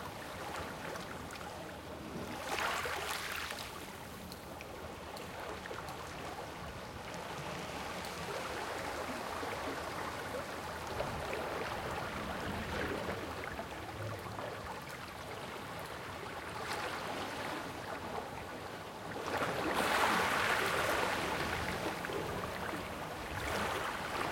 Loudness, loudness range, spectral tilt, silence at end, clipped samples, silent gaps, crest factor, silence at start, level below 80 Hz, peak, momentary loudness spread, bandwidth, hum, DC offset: -39 LUFS; 10 LU; -3.5 dB/octave; 0 s; under 0.1%; none; 22 dB; 0 s; -58 dBFS; -18 dBFS; 12 LU; 17 kHz; none; under 0.1%